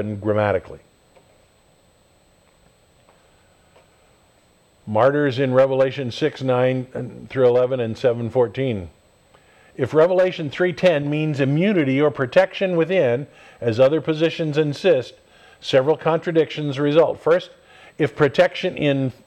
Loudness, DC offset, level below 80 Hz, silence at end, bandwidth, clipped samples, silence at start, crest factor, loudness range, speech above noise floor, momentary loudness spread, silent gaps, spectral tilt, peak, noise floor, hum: -20 LUFS; under 0.1%; -58 dBFS; 0.15 s; 9.2 kHz; under 0.1%; 0 s; 18 dB; 4 LU; 38 dB; 9 LU; none; -7 dB/octave; -4 dBFS; -57 dBFS; none